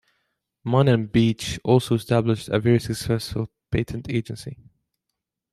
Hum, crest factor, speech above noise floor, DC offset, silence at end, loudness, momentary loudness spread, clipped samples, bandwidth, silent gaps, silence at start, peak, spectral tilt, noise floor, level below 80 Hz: none; 20 dB; 61 dB; under 0.1%; 1 s; -23 LUFS; 12 LU; under 0.1%; 13.5 kHz; none; 0.65 s; -4 dBFS; -6.5 dB/octave; -82 dBFS; -48 dBFS